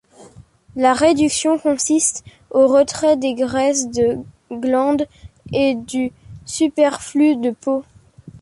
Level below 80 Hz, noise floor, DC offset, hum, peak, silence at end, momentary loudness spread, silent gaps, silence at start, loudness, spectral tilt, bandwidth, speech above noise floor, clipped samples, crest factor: -50 dBFS; -45 dBFS; under 0.1%; none; -2 dBFS; 0.05 s; 12 LU; none; 0.2 s; -18 LUFS; -3.5 dB/octave; 11.5 kHz; 28 dB; under 0.1%; 16 dB